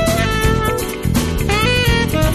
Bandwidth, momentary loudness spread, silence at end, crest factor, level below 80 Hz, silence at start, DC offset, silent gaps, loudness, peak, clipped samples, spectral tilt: 13.5 kHz; 5 LU; 0 s; 12 dB; -22 dBFS; 0 s; under 0.1%; none; -16 LUFS; -4 dBFS; under 0.1%; -5 dB/octave